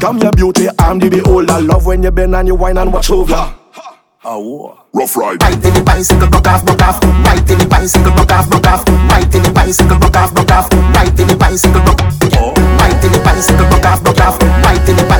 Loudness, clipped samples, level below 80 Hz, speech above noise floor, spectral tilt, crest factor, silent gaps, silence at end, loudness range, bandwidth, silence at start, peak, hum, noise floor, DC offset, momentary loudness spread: -9 LUFS; 0.4%; -12 dBFS; 26 dB; -5.5 dB/octave; 8 dB; none; 0 s; 5 LU; over 20 kHz; 0 s; 0 dBFS; none; -34 dBFS; under 0.1%; 5 LU